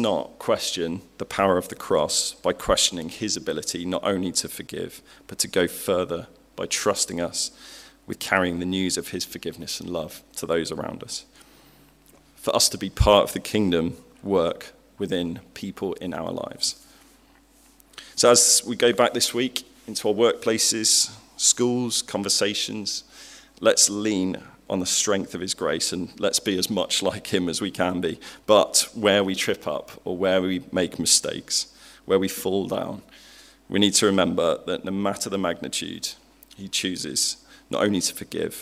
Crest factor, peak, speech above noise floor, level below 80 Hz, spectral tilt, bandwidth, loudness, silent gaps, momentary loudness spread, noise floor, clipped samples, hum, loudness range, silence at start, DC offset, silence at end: 24 dB; 0 dBFS; 32 dB; -46 dBFS; -2.5 dB/octave; 16 kHz; -23 LUFS; none; 15 LU; -56 dBFS; under 0.1%; none; 6 LU; 0 s; under 0.1%; 0 s